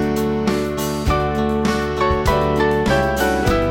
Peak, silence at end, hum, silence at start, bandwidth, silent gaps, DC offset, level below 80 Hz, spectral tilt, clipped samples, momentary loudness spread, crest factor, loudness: 0 dBFS; 0 s; none; 0 s; 17 kHz; none; under 0.1%; -28 dBFS; -6 dB/octave; under 0.1%; 3 LU; 16 dB; -18 LUFS